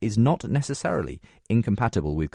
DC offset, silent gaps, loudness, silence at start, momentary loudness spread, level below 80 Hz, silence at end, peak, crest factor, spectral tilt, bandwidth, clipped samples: under 0.1%; none; -25 LUFS; 0 s; 8 LU; -42 dBFS; 0.05 s; -10 dBFS; 14 dB; -7 dB/octave; 10.5 kHz; under 0.1%